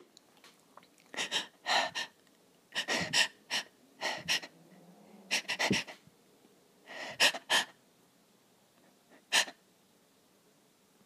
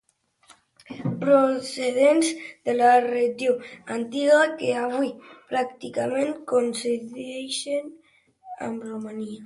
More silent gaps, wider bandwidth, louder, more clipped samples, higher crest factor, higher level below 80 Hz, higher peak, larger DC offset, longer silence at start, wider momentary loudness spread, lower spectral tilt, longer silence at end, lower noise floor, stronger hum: neither; first, 15.5 kHz vs 11.5 kHz; second, -32 LUFS vs -24 LUFS; neither; first, 26 dB vs 18 dB; about the same, -76 dBFS vs -72 dBFS; second, -12 dBFS vs -6 dBFS; neither; second, 0.45 s vs 0.9 s; about the same, 16 LU vs 15 LU; second, -1 dB/octave vs -4.5 dB/octave; first, 1.55 s vs 0 s; first, -67 dBFS vs -58 dBFS; neither